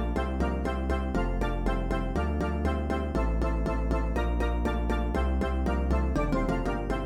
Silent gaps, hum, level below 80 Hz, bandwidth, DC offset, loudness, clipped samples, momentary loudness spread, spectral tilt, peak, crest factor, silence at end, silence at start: none; none; -30 dBFS; 10.5 kHz; under 0.1%; -29 LUFS; under 0.1%; 2 LU; -7.5 dB/octave; -14 dBFS; 14 dB; 0 s; 0 s